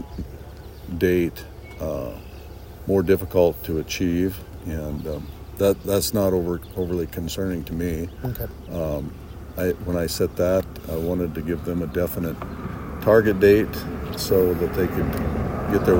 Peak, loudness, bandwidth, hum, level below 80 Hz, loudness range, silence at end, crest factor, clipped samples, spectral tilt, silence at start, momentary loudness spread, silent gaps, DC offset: -4 dBFS; -23 LUFS; 16.5 kHz; none; -38 dBFS; 6 LU; 0 s; 20 dB; under 0.1%; -6 dB/octave; 0 s; 16 LU; none; under 0.1%